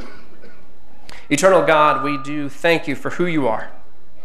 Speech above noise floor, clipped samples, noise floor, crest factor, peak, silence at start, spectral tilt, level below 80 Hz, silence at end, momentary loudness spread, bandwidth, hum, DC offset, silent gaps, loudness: 32 dB; under 0.1%; -50 dBFS; 18 dB; -2 dBFS; 0 s; -4.5 dB/octave; -54 dBFS; 0 s; 13 LU; 15 kHz; none; 7%; none; -18 LUFS